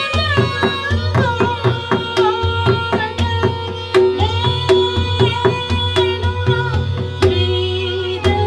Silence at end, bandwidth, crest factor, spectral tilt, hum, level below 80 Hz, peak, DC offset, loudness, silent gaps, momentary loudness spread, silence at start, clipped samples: 0 s; 11 kHz; 16 dB; -6.5 dB/octave; none; -34 dBFS; 0 dBFS; under 0.1%; -16 LUFS; none; 5 LU; 0 s; under 0.1%